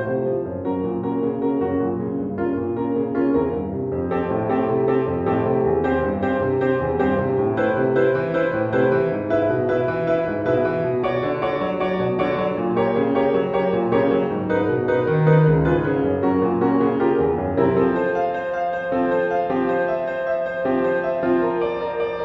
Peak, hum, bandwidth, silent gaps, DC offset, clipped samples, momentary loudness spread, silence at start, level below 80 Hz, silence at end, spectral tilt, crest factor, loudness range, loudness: -4 dBFS; none; 5.8 kHz; none; under 0.1%; under 0.1%; 5 LU; 0 s; -46 dBFS; 0 s; -9.5 dB/octave; 16 dB; 4 LU; -21 LUFS